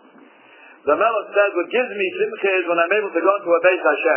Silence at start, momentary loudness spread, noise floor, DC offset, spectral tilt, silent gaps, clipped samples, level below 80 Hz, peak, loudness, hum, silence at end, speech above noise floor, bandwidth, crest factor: 0.85 s; 5 LU; -48 dBFS; under 0.1%; -7.5 dB/octave; none; under 0.1%; -74 dBFS; -2 dBFS; -19 LUFS; none; 0 s; 30 dB; 3.2 kHz; 18 dB